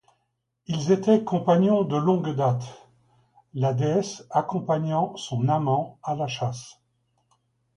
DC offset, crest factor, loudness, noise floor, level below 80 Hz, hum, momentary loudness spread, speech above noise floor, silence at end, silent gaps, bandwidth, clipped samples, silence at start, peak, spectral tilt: under 0.1%; 18 dB; -24 LUFS; -76 dBFS; -64 dBFS; none; 11 LU; 53 dB; 1.05 s; none; 10.5 kHz; under 0.1%; 0.7 s; -8 dBFS; -7 dB/octave